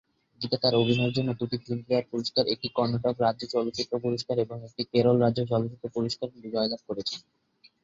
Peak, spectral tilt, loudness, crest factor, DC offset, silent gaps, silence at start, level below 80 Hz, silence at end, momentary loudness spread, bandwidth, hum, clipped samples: -10 dBFS; -6.5 dB/octave; -28 LUFS; 18 dB; under 0.1%; none; 0.4 s; -62 dBFS; 0.65 s; 10 LU; 7.8 kHz; none; under 0.1%